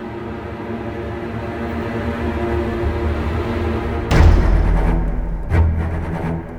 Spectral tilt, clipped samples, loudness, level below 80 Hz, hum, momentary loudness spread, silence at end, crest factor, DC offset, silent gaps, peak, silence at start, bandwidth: -8 dB/octave; under 0.1%; -20 LUFS; -20 dBFS; none; 12 LU; 0 s; 18 dB; under 0.1%; none; 0 dBFS; 0 s; 8.6 kHz